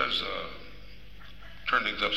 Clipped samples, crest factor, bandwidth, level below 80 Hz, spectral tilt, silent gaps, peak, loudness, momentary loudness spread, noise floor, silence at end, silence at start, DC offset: under 0.1%; 20 dB; 16 kHz; -52 dBFS; -3.5 dB/octave; none; -14 dBFS; -30 LUFS; 23 LU; -50 dBFS; 0 s; 0 s; 0.7%